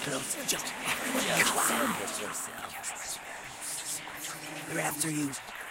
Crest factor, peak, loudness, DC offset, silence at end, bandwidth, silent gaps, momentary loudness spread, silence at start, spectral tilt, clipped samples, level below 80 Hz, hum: 22 dB; -12 dBFS; -31 LUFS; under 0.1%; 0 s; 16 kHz; none; 13 LU; 0 s; -2 dB/octave; under 0.1%; -66 dBFS; none